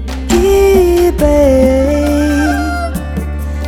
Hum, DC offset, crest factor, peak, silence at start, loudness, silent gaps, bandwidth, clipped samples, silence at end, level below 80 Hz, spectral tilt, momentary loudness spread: none; under 0.1%; 10 dB; 0 dBFS; 0 s; -11 LUFS; none; 18 kHz; under 0.1%; 0 s; -18 dBFS; -6.5 dB/octave; 11 LU